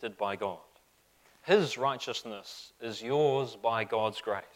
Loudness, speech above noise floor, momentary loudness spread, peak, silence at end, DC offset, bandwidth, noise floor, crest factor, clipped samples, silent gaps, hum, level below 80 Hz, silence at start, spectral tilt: -31 LUFS; 35 dB; 16 LU; -12 dBFS; 0.1 s; under 0.1%; 16 kHz; -66 dBFS; 20 dB; under 0.1%; none; none; -76 dBFS; 0 s; -4.5 dB/octave